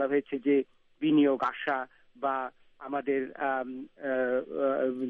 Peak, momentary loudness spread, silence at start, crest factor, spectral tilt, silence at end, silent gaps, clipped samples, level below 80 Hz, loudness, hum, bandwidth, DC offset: -14 dBFS; 14 LU; 0 s; 16 dB; -4 dB/octave; 0 s; none; under 0.1%; -74 dBFS; -30 LUFS; none; 4.4 kHz; under 0.1%